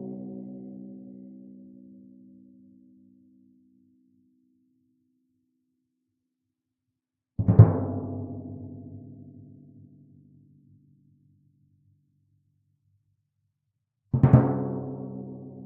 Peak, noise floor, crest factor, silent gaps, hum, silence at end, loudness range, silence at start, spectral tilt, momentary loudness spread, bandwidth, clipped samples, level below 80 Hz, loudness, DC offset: -2 dBFS; -85 dBFS; 28 dB; none; none; 0 s; 22 LU; 0 s; -12.5 dB/octave; 28 LU; 2.6 kHz; under 0.1%; -52 dBFS; -24 LUFS; under 0.1%